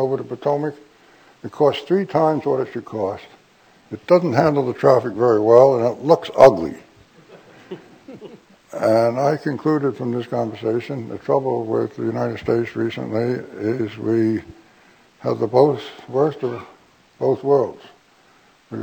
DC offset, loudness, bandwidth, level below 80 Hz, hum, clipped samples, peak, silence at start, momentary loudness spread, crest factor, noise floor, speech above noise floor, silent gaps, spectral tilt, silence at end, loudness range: under 0.1%; -19 LUFS; 18.5 kHz; -58 dBFS; none; under 0.1%; 0 dBFS; 0 s; 19 LU; 20 dB; -54 dBFS; 36 dB; none; -7.5 dB/octave; 0 s; 7 LU